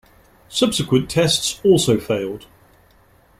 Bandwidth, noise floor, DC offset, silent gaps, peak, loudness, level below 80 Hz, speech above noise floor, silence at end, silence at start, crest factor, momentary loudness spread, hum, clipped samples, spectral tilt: 16 kHz; -53 dBFS; under 0.1%; none; -2 dBFS; -18 LUFS; -48 dBFS; 35 dB; 1 s; 0.5 s; 18 dB; 10 LU; none; under 0.1%; -4.5 dB/octave